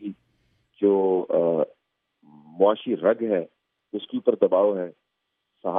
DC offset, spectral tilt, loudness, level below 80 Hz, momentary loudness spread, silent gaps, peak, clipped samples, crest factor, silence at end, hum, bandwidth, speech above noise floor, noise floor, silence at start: under 0.1%; -10.5 dB/octave; -23 LUFS; -80 dBFS; 15 LU; none; -6 dBFS; under 0.1%; 20 dB; 0 s; none; 3.8 kHz; 56 dB; -79 dBFS; 0 s